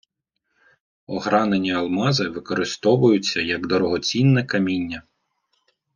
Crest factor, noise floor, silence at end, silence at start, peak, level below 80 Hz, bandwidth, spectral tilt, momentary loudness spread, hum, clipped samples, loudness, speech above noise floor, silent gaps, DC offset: 18 dB; -77 dBFS; 0.95 s; 1.1 s; -4 dBFS; -60 dBFS; 9.8 kHz; -5.5 dB/octave; 9 LU; none; under 0.1%; -21 LUFS; 57 dB; none; under 0.1%